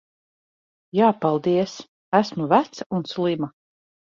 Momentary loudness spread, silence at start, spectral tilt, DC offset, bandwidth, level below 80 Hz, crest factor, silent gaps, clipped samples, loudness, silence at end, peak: 10 LU; 0.95 s; -6.5 dB/octave; under 0.1%; 7.4 kHz; -66 dBFS; 20 dB; 1.88-2.12 s, 2.86-2.90 s; under 0.1%; -22 LUFS; 0.65 s; -4 dBFS